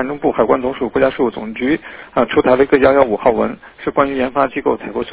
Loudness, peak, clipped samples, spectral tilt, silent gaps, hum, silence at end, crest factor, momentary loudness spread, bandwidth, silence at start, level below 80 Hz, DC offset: -16 LUFS; 0 dBFS; under 0.1%; -10 dB/octave; none; none; 0 s; 16 dB; 10 LU; 4 kHz; 0 s; -42 dBFS; under 0.1%